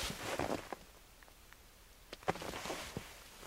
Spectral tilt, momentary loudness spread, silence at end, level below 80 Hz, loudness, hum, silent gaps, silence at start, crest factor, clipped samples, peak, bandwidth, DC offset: -3.5 dB/octave; 20 LU; 0 s; -58 dBFS; -42 LUFS; none; none; 0 s; 26 dB; under 0.1%; -18 dBFS; 16 kHz; under 0.1%